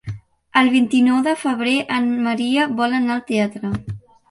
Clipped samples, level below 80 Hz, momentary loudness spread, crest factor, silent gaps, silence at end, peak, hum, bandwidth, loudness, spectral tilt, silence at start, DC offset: under 0.1%; -50 dBFS; 13 LU; 16 dB; none; 0.3 s; -2 dBFS; none; 11.5 kHz; -18 LUFS; -5 dB/octave; 0.05 s; under 0.1%